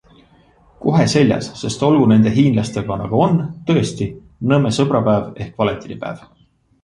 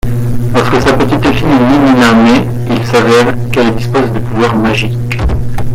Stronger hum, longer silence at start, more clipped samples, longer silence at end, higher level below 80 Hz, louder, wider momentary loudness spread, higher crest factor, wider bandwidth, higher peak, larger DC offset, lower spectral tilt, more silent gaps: neither; first, 0.8 s vs 0.05 s; neither; first, 0.65 s vs 0 s; second, -46 dBFS vs -22 dBFS; second, -17 LUFS vs -10 LUFS; first, 14 LU vs 8 LU; first, 16 dB vs 8 dB; second, 11 kHz vs 16 kHz; about the same, -2 dBFS vs 0 dBFS; neither; about the same, -6.5 dB/octave vs -6.5 dB/octave; neither